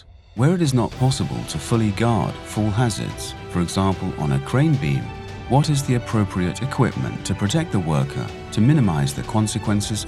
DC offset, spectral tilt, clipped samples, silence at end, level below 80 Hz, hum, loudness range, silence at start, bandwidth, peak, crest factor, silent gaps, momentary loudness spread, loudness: under 0.1%; -6 dB/octave; under 0.1%; 0 s; -40 dBFS; none; 1 LU; 0.15 s; 13.5 kHz; -4 dBFS; 16 dB; none; 8 LU; -21 LUFS